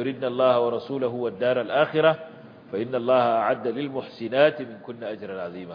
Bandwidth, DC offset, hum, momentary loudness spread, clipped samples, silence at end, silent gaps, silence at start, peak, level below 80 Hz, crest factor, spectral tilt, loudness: 5.2 kHz; under 0.1%; none; 14 LU; under 0.1%; 0 s; none; 0 s; -4 dBFS; -72 dBFS; 20 dB; -8.5 dB/octave; -24 LUFS